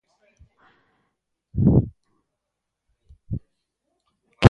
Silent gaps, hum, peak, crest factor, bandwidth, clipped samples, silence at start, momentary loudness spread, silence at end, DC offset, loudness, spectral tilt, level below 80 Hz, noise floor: none; none; 0 dBFS; 24 dB; 9.8 kHz; under 0.1%; 1.55 s; 16 LU; 0 s; under 0.1%; -23 LUFS; -8 dB/octave; -38 dBFS; -82 dBFS